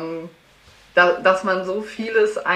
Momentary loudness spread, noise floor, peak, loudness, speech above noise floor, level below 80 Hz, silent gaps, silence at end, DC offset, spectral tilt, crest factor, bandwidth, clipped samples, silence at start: 13 LU; -51 dBFS; -2 dBFS; -19 LUFS; 32 dB; -60 dBFS; none; 0 s; under 0.1%; -4.5 dB/octave; 18 dB; 11.5 kHz; under 0.1%; 0 s